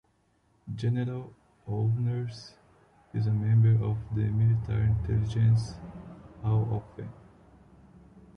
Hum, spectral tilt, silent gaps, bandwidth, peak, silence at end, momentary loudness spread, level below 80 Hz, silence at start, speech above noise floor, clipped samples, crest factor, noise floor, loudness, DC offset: none; -9 dB/octave; none; 6.6 kHz; -14 dBFS; 0.15 s; 20 LU; -48 dBFS; 0.65 s; 42 dB; under 0.1%; 14 dB; -69 dBFS; -28 LUFS; under 0.1%